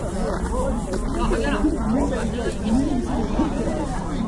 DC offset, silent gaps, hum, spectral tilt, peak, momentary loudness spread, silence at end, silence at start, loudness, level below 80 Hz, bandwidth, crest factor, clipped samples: under 0.1%; none; none; -6.5 dB/octave; -8 dBFS; 4 LU; 0 s; 0 s; -24 LUFS; -28 dBFS; 11.5 kHz; 14 dB; under 0.1%